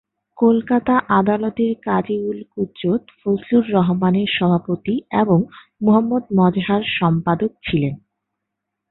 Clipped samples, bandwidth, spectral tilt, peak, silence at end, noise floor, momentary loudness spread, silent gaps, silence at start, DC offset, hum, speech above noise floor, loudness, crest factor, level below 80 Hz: under 0.1%; 4.1 kHz; -12 dB/octave; -2 dBFS; 0.95 s; -80 dBFS; 7 LU; none; 0.4 s; under 0.1%; none; 62 dB; -19 LUFS; 16 dB; -52 dBFS